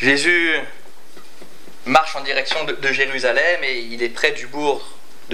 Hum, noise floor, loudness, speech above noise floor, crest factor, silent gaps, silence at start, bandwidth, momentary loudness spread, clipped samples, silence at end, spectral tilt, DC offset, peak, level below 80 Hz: none; -46 dBFS; -18 LUFS; 27 dB; 20 dB; none; 0 s; 16 kHz; 9 LU; under 0.1%; 0 s; -2.5 dB/octave; 5%; 0 dBFS; -66 dBFS